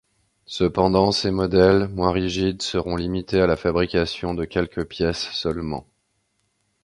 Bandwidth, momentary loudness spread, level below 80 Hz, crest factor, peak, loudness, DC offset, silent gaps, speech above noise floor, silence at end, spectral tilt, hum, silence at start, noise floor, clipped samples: 11.5 kHz; 9 LU; -40 dBFS; 20 dB; -2 dBFS; -22 LUFS; under 0.1%; none; 49 dB; 1 s; -6 dB/octave; none; 0.5 s; -70 dBFS; under 0.1%